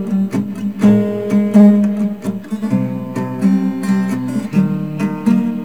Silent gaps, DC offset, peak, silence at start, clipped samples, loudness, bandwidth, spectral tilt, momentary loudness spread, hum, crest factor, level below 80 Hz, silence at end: none; 0.7%; 0 dBFS; 0 s; under 0.1%; -16 LUFS; 11 kHz; -8.5 dB/octave; 12 LU; none; 14 dB; -56 dBFS; 0 s